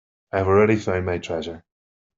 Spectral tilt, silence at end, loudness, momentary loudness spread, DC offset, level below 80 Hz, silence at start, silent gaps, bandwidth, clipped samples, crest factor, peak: -7 dB/octave; 0.6 s; -22 LUFS; 15 LU; under 0.1%; -58 dBFS; 0.35 s; none; 7.6 kHz; under 0.1%; 20 dB; -4 dBFS